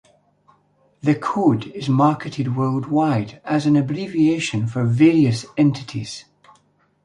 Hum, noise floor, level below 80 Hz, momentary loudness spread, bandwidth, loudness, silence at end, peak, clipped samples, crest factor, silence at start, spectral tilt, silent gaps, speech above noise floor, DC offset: 50 Hz at -45 dBFS; -60 dBFS; -58 dBFS; 9 LU; 11 kHz; -19 LUFS; 0.85 s; -4 dBFS; under 0.1%; 16 dB; 1.05 s; -7 dB/octave; none; 41 dB; under 0.1%